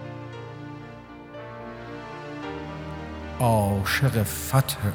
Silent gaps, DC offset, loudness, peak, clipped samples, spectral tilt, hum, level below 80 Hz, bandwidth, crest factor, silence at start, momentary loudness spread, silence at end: none; under 0.1%; -26 LUFS; -6 dBFS; under 0.1%; -5.5 dB/octave; none; -46 dBFS; over 20 kHz; 22 dB; 0 s; 17 LU; 0 s